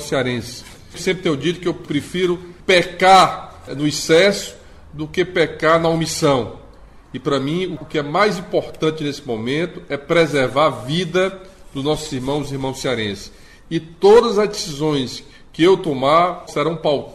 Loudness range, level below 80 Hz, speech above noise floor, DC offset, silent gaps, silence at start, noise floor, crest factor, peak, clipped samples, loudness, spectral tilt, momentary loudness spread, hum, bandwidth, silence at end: 5 LU; -46 dBFS; 24 dB; under 0.1%; none; 0 s; -42 dBFS; 16 dB; -2 dBFS; under 0.1%; -18 LUFS; -4.5 dB/octave; 15 LU; none; 14.5 kHz; 0 s